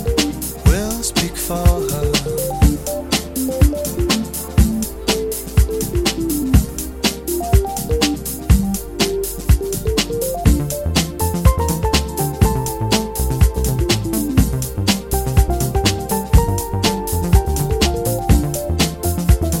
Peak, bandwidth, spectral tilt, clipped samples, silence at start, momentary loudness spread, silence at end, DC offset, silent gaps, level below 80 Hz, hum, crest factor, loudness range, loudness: 0 dBFS; 17 kHz; -5 dB/octave; under 0.1%; 0 s; 4 LU; 0 s; 0.3%; none; -20 dBFS; none; 16 dB; 1 LU; -18 LUFS